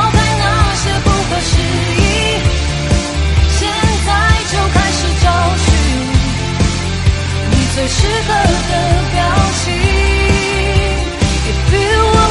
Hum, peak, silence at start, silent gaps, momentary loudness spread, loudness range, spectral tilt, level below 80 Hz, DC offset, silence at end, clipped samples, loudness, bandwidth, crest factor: none; 0 dBFS; 0 s; none; 3 LU; 1 LU; -4.5 dB/octave; -18 dBFS; under 0.1%; 0 s; under 0.1%; -13 LUFS; 11.5 kHz; 12 dB